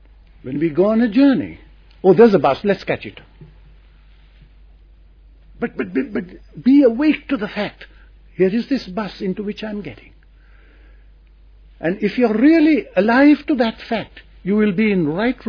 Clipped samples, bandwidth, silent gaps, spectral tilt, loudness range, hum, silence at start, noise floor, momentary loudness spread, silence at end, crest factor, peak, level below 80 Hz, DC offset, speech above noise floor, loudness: under 0.1%; 5.4 kHz; none; -8.5 dB/octave; 12 LU; none; 0.45 s; -47 dBFS; 16 LU; 0 s; 18 dB; 0 dBFS; -46 dBFS; under 0.1%; 30 dB; -17 LUFS